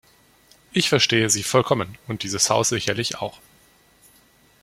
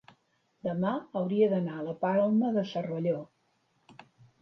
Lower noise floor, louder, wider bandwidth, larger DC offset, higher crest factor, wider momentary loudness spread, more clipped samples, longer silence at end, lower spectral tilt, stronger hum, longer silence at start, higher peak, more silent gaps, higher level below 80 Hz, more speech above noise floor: second, -56 dBFS vs -73 dBFS; first, -21 LUFS vs -30 LUFS; first, 16.5 kHz vs 6.2 kHz; neither; first, 22 dB vs 16 dB; first, 13 LU vs 9 LU; neither; first, 1.3 s vs 0.5 s; second, -3 dB/octave vs -9 dB/octave; neither; about the same, 0.75 s vs 0.65 s; first, -2 dBFS vs -14 dBFS; neither; first, -58 dBFS vs -76 dBFS; second, 35 dB vs 44 dB